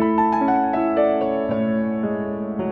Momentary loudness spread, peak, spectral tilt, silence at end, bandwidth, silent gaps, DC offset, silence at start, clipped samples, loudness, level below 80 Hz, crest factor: 7 LU; -8 dBFS; -9.5 dB/octave; 0 s; 5.4 kHz; none; under 0.1%; 0 s; under 0.1%; -21 LUFS; -52 dBFS; 12 dB